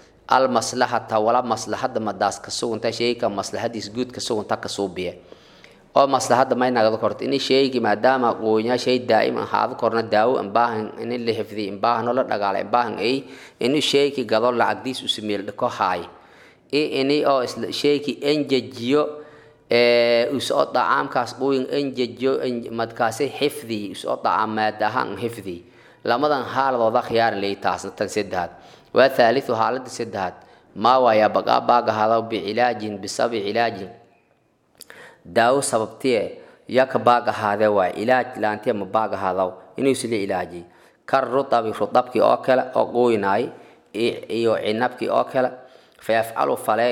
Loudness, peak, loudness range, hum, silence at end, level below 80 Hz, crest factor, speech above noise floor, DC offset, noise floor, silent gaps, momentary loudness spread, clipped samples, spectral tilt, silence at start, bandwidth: -21 LUFS; -2 dBFS; 4 LU; none; 0 s; -66 dBFS; 20 dB; 42 dB; under 0.1%; -63 dBFS; none; 9 LU; under 0.1%; -4.5 dB/octave; 0.3 s; 17 kHz